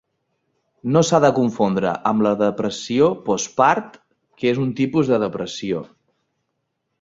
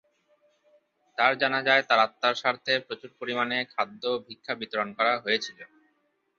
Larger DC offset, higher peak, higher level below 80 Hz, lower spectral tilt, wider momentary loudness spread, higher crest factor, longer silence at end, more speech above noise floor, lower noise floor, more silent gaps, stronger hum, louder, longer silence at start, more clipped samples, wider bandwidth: neither; first, -2 dBFS vs -8 dBFS; first, -58 dBFS vs -76 dBFS; first, -5.5 dB/octave vs -3.5 dB/octave; second, 10 LU vs 13 LU; about the same, 18 dB vs 22 dB; first, 1.15 s vs 0.75 s; first, 56 dB vs 45 dB; about the same, -75 dBFS vs -72 dBFS; neither; neither; first, -19 LUFS vs -26 LUFS; second, 0.85 s vs 1.2 s; neither; about the same, 7.8 kHz vs 7.6 kHz